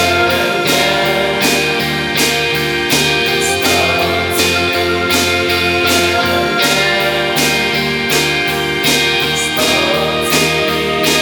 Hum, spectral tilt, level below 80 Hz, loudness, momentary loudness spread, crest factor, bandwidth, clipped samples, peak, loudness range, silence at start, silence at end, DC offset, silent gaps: none; -2.5 dB/octave; -38 dBFS; -12 LUFS; 3 LU; 14 dB; over 20 kHz; under 0.1%; 0 dBFS; 0 LU; 0 s; 0 s; under 0.1%; none